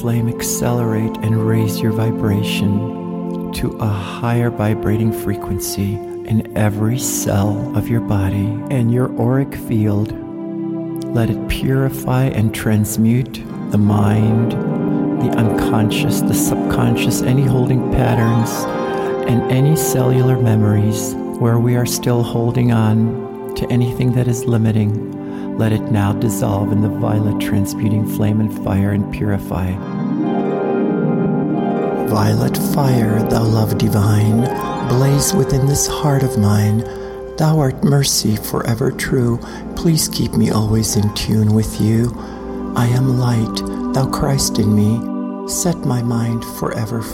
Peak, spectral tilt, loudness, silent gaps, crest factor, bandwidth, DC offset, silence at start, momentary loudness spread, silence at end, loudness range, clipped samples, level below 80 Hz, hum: -4 dBFS; -6 dB/octave; -17 LUFS; none; 12 dB; 17 kHz; under 0.1%; 0 s; 7 LU; 0 s; 3 LU; under 0.1%; -38 dBFS; none